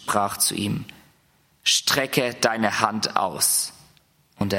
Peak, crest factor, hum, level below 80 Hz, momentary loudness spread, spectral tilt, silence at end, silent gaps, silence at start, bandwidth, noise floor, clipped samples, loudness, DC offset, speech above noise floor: -2 dBFS; 22 dB; none; -62 dBFS; 10 LU; -2 dB/octave; 0 s; none; 0 s; 16.5 kHz; -62 dBFS; under 0.1%; -22 LUFS; under 0.1%; 39 dB